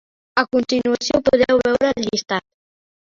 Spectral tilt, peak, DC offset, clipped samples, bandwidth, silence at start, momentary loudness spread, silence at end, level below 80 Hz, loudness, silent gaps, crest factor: -4 dB/octave; -2 dBFS; under 0.1%; under 0.1%; 7.4 kHz; 0.35 s; 7 LU; 0.65 s; -50 dBFS; -19 LUFS; none; 16 dB